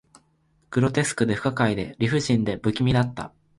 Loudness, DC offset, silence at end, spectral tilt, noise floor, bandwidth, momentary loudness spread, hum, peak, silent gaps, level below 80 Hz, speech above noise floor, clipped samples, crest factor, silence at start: -24 LUFS; under 0.1%; 0.3 s; -6 dB/octave; -65 dBFS; 11.5 kHz; 5 LU; none; -8 dBFS; none; -48 dBFS; 42 dB; under 0.1%; 18 dB; 0.7 s